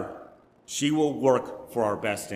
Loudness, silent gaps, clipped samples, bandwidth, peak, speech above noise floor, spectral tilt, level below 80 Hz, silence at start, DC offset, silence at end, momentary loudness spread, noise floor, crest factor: -26 LUFS; none; under 0.1%; 16 kHz; -8 dBFS; 25 dB; -4.5 dB/octave; -66 dBFS; 0 s; under 0.1%; 0 s; 12 LU; -51 dBFS; 18 dB